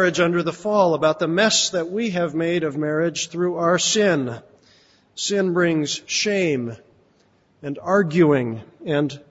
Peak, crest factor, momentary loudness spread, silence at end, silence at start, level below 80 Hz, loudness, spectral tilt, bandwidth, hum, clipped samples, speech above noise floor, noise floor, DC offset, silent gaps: -4 dBFS; 16 dB; 12 LU; 0.1 s; 0 s; -62 dBFS; -20 LUFS; -4 dB/octave; 8 kHz; none; under 0.1%; 39 dB; -60 dBFS; under 0.1%; none